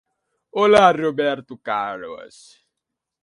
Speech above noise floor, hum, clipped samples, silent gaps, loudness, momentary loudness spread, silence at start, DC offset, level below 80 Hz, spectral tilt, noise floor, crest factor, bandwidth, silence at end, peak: 63 dB; none; under 0.1%; none; -18 LUFS; 20 LU; 0.55 s; under 0.1%; -60 dBFS; -5 dB/octave; -82 dBFS; 20 dB; 11.5 kHz; 1 s; -2 dBFS